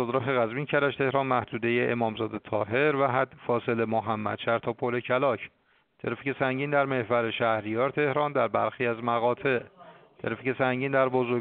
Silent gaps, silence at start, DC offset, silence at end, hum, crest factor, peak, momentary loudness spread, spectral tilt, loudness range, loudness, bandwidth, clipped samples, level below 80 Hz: none; 0 s; under 0.1%; 0 s; none; 18 dB; -8 dBFS; 6 LU; -4.5 dB/octave; 2 LU; -27 LUFS; 4.6 kHz; under 0.1%; -68 dBFS